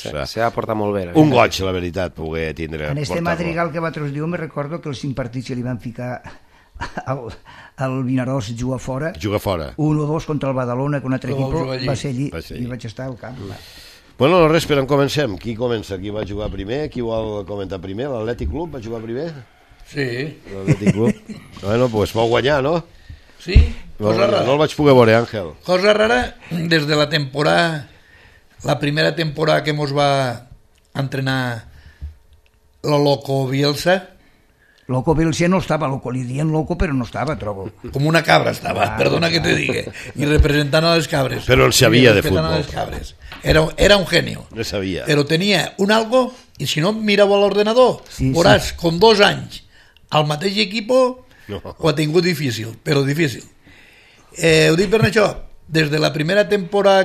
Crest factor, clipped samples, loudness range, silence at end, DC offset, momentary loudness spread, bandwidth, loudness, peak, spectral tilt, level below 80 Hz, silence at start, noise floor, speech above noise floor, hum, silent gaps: 18 dB; under 0.1%; 9 LU; 0 s; under 0.1%; 14 LU; 14 kHz; -18 LUFS; 0 dBFS; -5.5 dB/octave; -32 dBFS; 0 s; -54 dBFS; 36 dB; none; none